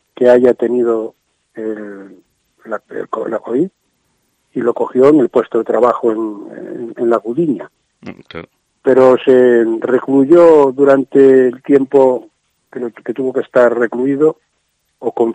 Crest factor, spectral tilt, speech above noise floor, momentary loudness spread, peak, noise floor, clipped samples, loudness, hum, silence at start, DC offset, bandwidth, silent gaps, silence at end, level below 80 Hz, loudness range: 14 dB; -8 dB/octave; 53 dB; 18 LU; 0 dBFS; -65 dBFS; under 0.1%; -12 LUFS; none; 0.2 s; under 0.1%; 9 kHz; none; 0 s; -62 dBFS; 11 LU